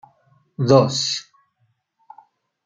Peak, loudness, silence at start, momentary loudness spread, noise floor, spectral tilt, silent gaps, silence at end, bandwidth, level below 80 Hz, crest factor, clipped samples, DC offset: -2 dBFS; -18 LUFS; 0.6 s; 14 LU; -68 dBFS; -5 dB/octave; none; 1.45 s; 9.4 kHz; -62 dBFS; 22 dB; under 0.1%; under 0.1%